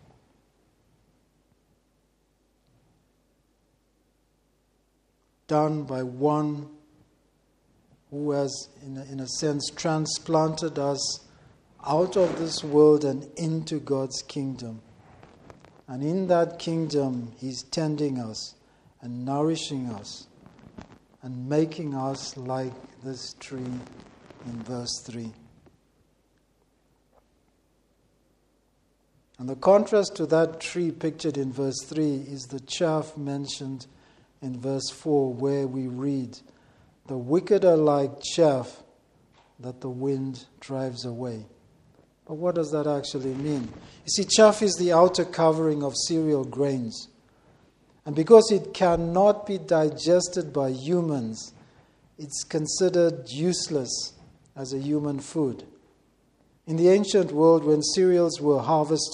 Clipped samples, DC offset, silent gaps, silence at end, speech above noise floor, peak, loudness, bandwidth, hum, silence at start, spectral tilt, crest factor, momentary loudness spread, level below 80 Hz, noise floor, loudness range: under 0.1%; under 0.1%; none; 0 s; 44 dB; -2 dBFS; -25 LUFS; 11 kHz; none; 5.5 s; -5 dB/octave; 26 dB; 19 LU; -62 dBFS; -68 dBFS; 11 LU